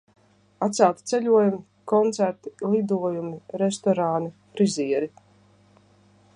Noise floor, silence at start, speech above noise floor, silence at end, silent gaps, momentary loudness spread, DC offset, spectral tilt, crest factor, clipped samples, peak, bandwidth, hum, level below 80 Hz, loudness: -57 dBFS; 0.6 s; 34 dB; 1.3 s; none; 11 LU; under 0.1%; -6 dB/octave; 20 dB; under 0.1%; -4 dBFS; 11 kHz; 50 Hz at -45 dBFS; -72 dBFS; -24 LUFS